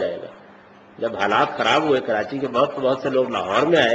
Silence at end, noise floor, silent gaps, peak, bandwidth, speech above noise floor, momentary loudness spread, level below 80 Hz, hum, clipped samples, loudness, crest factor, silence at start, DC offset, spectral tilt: 0 s; -47 dBFS; none; -2 dBFS; 8.2 kHz; 27 dB; 10 LU; -62 dBFS; none; under 0.1%; -20 LUFS; 18 dB; 0 s; under 0.1%; -5 dB/octave